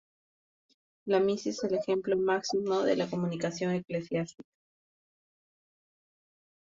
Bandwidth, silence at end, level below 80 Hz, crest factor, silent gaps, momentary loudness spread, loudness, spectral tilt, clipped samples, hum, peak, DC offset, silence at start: 7.6 kHz; 2.35 s; -72 dBFS; 18 dB; none; 6 LU; -30 LUFS; -5.5 dB/octave; under 0.1%; none; -14 dBFS; under 0.1%; 1.05 s